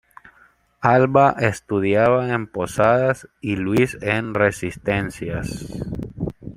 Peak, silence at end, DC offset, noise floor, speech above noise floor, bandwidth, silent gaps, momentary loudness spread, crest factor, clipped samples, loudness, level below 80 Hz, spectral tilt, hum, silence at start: -2 dBFS; 0.05 s; under 0.1%; -56 dBFS; 36 dB; 15.5 kHz; none; 14 LU; 18 dB; under 0.1%; -20 LUFS; -46 dBFS; -6.5 dB/octave; none; 0.8 s